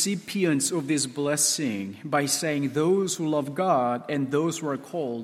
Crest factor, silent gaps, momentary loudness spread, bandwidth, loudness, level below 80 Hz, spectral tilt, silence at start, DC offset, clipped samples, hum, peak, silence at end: 16 dB; none; 7 LU; 16 kHz; -25 LUFS; -72 dBFS; -4 dB/octave; 0 s; under 0.1%; under 0.1%; none; -10 dBFS; 0 s